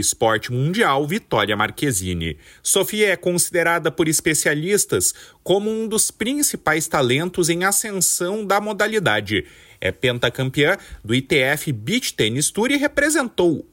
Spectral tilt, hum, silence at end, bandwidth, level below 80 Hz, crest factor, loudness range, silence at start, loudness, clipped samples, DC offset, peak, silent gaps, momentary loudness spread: -3 dB/octave; none; 0.1 s; 16.5 kHz; -48 dBFS; 16 dB; 2 LU; 0 s; -19 LUFS; under 0.1%; under 0.1%; -4 dBFS; none; 5 LU